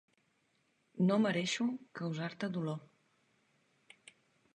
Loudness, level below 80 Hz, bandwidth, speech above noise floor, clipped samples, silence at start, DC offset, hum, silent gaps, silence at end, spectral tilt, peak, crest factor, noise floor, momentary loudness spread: -35 LUFS; -82 dBFS; 10 kHz; 42 dB; under 0.1%; 0.95 s; under 0.1%; none; none; 1.7 s; -5.5 dB/octave; -18 dBFS; 20 dB; -76 dBFS; 11 LU